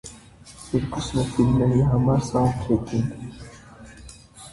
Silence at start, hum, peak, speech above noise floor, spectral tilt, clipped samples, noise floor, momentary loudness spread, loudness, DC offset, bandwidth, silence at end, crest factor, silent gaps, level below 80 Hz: 0.05 s; none; -8 dBFS; 25 dB; -7.5 dB/octave; under 0.1%; -46 dBFS; 24 LU; -22 LUFS; under 0.1%; 11.5 kHz; 0 s; 16 dB; none; -40 dBFS